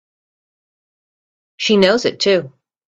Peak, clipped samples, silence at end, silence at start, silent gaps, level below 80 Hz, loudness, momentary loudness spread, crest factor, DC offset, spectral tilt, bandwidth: 0 dBFS; under 0.1%; 0.4 s; 1.6 s; none; -60 dBFS; -15 LUFS; 6 LU; 20 dB; under 0.1%; -4.5 dB/octave; 8.4 kHz